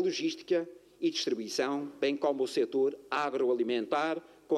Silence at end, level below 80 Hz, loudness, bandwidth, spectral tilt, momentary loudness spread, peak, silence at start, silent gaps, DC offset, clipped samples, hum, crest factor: 0 s; -80 dBFS; -32 LUFS; 13 kHz; -3.5 dB/octave; 4 LU; -16 dBFS; 0 s; none; under 0.1%; under 0.1%; none; 16 dB